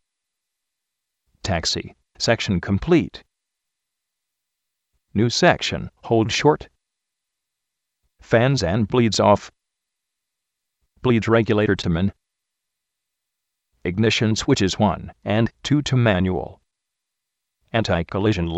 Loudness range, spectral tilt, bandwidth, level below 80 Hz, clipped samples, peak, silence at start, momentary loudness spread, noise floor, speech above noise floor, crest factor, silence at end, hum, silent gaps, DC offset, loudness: 3 LU; -5.5 dB/octave; 8.4 kHz; -46 dBFS; under 0.1%; -2 dBFS; 1.45 s; 10 LU; -82 dBFS; 63 dB; 20 dB; 0 s; none; none; under 0.1%; -20 LUFS